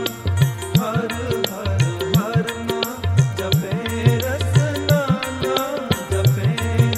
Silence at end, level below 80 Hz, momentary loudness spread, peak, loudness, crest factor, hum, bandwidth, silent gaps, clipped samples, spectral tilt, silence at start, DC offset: 0 s; -40 dBFS; 5 LU; -2 dBFS; -20 LUFS; 16 dB; none; 16 kHz; none; under 0.1%; -5.5 dB/octave; 0 s; under 0.1%